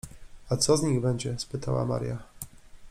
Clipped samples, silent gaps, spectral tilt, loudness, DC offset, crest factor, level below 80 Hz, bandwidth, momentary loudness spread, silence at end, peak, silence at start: under 0.1%; none; -5 dB/octave; -28 LUFS; under 0.1%; 20 dB; -50 dBFS; 16 kHz; 20 LU; 0 s; -10 dBFS; 0.05 s